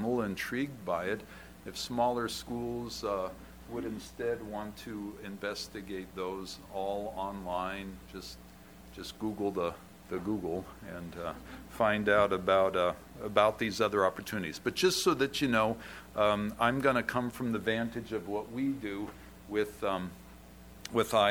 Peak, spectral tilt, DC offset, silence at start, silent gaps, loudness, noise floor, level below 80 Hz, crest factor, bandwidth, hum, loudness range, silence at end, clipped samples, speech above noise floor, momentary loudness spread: -10 dBFS; -4.5 dB/octave; under 0.1%; 0 s; none; -33 LUFS; -53 dBFS; -56 dBFS; 24 dB; over 20 kHz; none; 9 LU; 0 s; under 0.1%; 20 dB; 18 LU